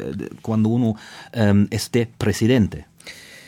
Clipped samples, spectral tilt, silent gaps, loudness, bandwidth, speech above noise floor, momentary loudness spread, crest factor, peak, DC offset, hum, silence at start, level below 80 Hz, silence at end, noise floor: under 0.1%; -6.5 dB/octave; none; -21 LUFS; 16 kHz; 21 dB; 19 LU; 16 dB; -6 dBFS; under 0.1%; none; 0 s; -48 dBFS; 0.1 s; -41 dBFS